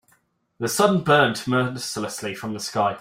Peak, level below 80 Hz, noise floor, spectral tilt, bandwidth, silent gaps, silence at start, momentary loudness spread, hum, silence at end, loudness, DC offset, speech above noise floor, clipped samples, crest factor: -4 dBFS; -62 dBFS; -65 dBFS; -4.5 dB/octave; 16 kHz; none; 0.6 s; 12 LU; none; 0 s; -22 LUFS; under 0.1%; 43 dB; under 0.1%; 20 dB